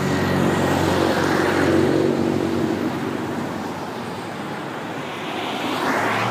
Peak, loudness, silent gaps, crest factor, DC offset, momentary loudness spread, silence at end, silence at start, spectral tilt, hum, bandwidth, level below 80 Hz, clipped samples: -6 dBFS; -22 LUFS; none; 16 dB; under 0.1%; 11 LU; 0 s; 0 s; -5.5 dB/octave; none; 15.5 kHz; -54 dBFS; under 0.1%